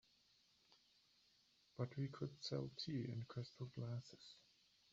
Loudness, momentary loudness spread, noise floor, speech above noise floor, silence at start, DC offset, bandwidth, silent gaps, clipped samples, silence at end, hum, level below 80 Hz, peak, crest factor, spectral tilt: -49 LUFS; 15 LU; -77 dBFS; 29 dB; 0.7 s; under 0.1%; 7.6 kHz; none; under 0.1%; 0.5 s; none; -80 dBFS; -32 dBFS; 20 dB; -6.5 dB/octave